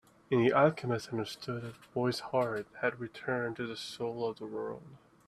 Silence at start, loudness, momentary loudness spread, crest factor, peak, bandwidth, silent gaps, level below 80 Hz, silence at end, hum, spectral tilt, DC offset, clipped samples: 0.3 s; -34 LUFS; 13 LU; 22 dB; -12 dBFS; 13.5 kHz; none; -70 dBFS; 0.3 s; none; -6 dB/octave; under 0.1%; under 0.1%